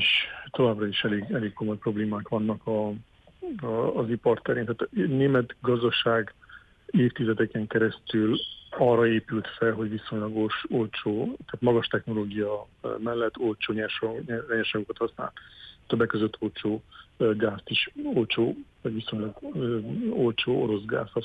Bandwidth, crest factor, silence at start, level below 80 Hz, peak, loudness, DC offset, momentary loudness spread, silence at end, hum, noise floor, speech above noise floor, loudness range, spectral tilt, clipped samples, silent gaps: 8.2 kHz; 16 dB; 0 s; -60 dBFS; -10 dBFS; -27 LUFS; under 0.1%; 9 LU; 0 s; none; -49 dBFS; 22 dB; 4 LU; -8 dB/octave; under 0.1%; none